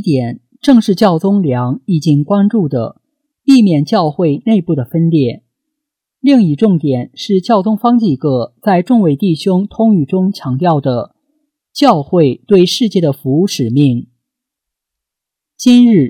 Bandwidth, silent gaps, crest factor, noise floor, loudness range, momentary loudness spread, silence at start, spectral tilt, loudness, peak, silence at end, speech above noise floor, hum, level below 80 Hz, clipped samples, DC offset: 14.5 kHz; none; 12 dB; -82 dBFS; 1 LU; 8 LU; 0 s; -7 dB/octave; -12 LUFS; 0 dBFS; 0 s; 71 dB; none; -54 dBFS; under 0.1%; under 0.1%